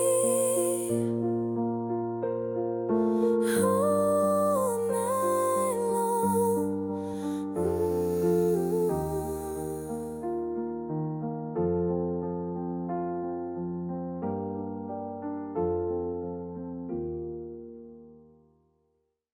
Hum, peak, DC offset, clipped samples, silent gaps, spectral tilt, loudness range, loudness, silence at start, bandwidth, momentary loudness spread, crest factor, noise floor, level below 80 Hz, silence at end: none; -14 dBFS; under 0.1%; under 0.1%; none; -6.5 dB/octave; 8 LU; -29 LUFS; 0 s; 18 kHz; 11 LU; 16 dB; -75 dBFS; -56 dBFS; 1.15 s